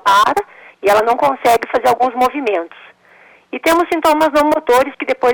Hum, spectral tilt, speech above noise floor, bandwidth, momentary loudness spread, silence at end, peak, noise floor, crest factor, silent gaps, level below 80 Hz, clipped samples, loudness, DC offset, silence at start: none; -3 dB/octave; 33 dB; 19.5 kHz; 8 LU; 0 s; -4 dBFS; -46 dBFS; 10 dB; none; -50 dBFS; under 0.1%; -14 LUFS; under 0.1%; 0.05 s